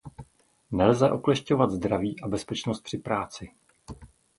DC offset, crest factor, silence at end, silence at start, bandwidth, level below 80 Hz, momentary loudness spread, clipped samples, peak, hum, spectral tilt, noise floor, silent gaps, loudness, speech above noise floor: under 0.1%; 22 dB; 0.3 s; 0.05 s; 11.5 kHz; -52 dBFS; 24 LU; under 0.1%; -6 dBFS; none; -6.5 dB/octave; -56 dBFS; none; -26 LUFS; 30 dB